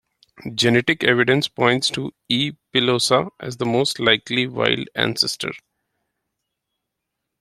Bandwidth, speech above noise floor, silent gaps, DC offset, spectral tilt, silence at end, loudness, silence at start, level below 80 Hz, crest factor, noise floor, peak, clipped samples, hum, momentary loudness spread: 15 kHz; 60 dB; none; under 0.1%; -4 dB/octave; 1.85 s; -19 LUFS; 0.4 s; -58 dBFS; 22 dB; -80 dBFS; 0 dBFS; under 0.1%; none; 12 LU